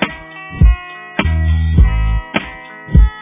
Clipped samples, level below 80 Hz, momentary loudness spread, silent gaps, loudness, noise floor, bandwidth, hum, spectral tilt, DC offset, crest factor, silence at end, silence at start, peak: 0.1%; -14 dBFS; 16 LU; none; -16 LUFS; -31 dBFS; 3.8 kHz; none; -10.5 dB/octave; under 0.1%; 14 dB; 0 s; 0 s; 0 dBFS